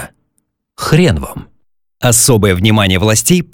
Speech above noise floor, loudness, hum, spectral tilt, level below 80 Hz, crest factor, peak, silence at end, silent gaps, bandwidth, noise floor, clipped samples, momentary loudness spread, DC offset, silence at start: 55 dB; -11 LUFS; none; -4 dB/octave; -34 dBFS; 12 dB; 0 dBFS; 0.1 s; none; 18 kHz; -66 dBFS; under 0.1%; 17 LU; under 0.1%; 0 s